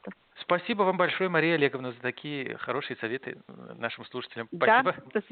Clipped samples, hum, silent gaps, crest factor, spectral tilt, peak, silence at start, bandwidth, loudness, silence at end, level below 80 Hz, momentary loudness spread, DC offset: under 0.1%; none; none; 20 dB; -3 dB/octave; -10 dBFS; 0.05 s; 4.6 kHz; -28 LUFS; 0.1 s; -76 dBFS; 15 LU; under 0.1%